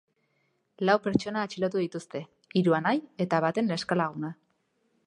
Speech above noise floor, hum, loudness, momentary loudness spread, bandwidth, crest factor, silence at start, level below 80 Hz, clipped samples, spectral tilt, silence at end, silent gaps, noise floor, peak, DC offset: 46 dB; none; -28 LUFS; 13 LU; 10.5 kHz; 20 dB; 0.8 s; -64 dBFS; under 0.1%; -6.5 dB/octave; 0.75 s; none; -73 dBFS; -8 dBFS; under 0.1%